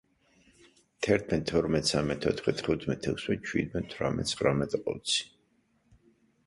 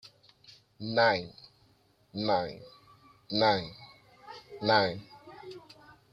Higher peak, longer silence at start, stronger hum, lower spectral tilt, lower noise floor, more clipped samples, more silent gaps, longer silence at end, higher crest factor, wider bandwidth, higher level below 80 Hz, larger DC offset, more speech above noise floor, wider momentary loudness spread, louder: about the same, -10 dBFS vs -10 dBFS; first, 1 s vs 0.05 s; neither; second, -4.5 dB/octave vs -6 dB/octave; first, -70 dBFS vs -66 dBFS; neither; neither; first, 1.2 s vs 0.55 s; about the same, 22 dB vs 22 dB; first, 11.5 kHz vs 7.6 kHz; first, -52 dBFS vs -68 dBFS; neither; first, 41 dB vs 37 dB; second, 5 LU vs 23 LU; about the same, -30 LUFS vs -29 LUFS